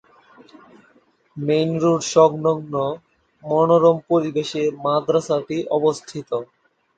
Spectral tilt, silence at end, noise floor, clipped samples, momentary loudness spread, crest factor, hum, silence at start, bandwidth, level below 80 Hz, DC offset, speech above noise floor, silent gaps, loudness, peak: -6 dB/octave; 0.55 s; -58 dBFS; under 0.1%; 13 LU; 18 dB; none; 1.35 s; 9 kHz; -64 dBFS; under 0.1%; 39 dB; none; -20 LUFS; -2 dBFS